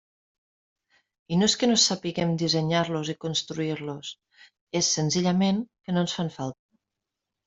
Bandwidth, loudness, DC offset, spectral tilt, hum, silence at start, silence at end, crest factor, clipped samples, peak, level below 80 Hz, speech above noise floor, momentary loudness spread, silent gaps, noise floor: 8.2 kHz; -25 LUFS; under 0.1%; -4 dB/octave; none; 1.3 s; 0.95 s; 18 dB; under 0.1%; -8 dBFS; -64 dBFS; 60 dB; 12 LU; 4.61-4.67 s; -86 dBFS